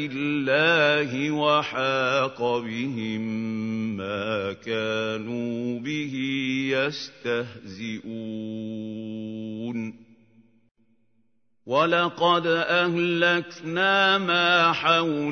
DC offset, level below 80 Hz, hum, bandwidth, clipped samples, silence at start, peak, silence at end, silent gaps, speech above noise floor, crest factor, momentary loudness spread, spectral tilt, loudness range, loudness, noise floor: under 0.1%; -70 dBFS; none; 6.6 kHz; under 0.1%; 0 s; -6 dBFS; 0 s; 10.71-10.75 s; 47 dB; 20 dB; 14 LU; -5 dB/octave; 13 LU; -24 LUFS; -72 dBFS